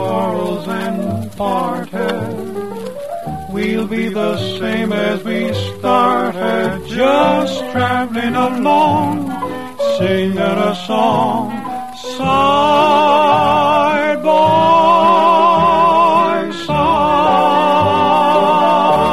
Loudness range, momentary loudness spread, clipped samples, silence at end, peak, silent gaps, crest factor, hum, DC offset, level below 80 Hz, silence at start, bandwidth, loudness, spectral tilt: 9 LU; 11 LU; under 0.1%; 0 s; 0 dBFS; none; 12 dB; none; 1%; -46 dBFS; 0 s; 14 kHz; -14 LUFS; -6 dB/octave